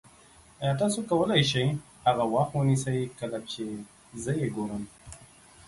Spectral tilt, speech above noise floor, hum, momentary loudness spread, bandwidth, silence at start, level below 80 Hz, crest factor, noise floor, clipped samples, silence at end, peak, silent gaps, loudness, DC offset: -5.5 dB/octave; 28 dB; none; 18 LU; 11.5 kHz; 0.6 s; -58 dBFS; 22 dB; -56 dBFS; under 0.1%; 0.45 s; -8 dBFS; none; -28 LUFS; under 0.1%